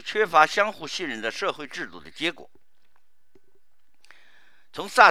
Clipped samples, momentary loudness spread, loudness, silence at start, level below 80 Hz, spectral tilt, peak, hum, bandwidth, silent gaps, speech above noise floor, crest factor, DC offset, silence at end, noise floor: under 0.1%; 17 LU; -24 LUFS; 0.05 s; -72 dBFS; -2.5 dB/octave; 0 dBFS; none; 15 kHz; none; 48 dB; 26 dB; 0.5%; 0 s; -71 dBFS